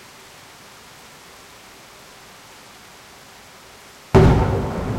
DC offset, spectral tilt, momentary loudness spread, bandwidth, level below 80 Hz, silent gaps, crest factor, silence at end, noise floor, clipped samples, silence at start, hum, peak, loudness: under 0.1%; -7.5 dB/octave; 27 LU; 16 kHz; -32 dBFS; none; 18 dB; 0 s; -44 dBFS; under 0.1%; 4.15 s; none; -4 dBFS; -17 LUFS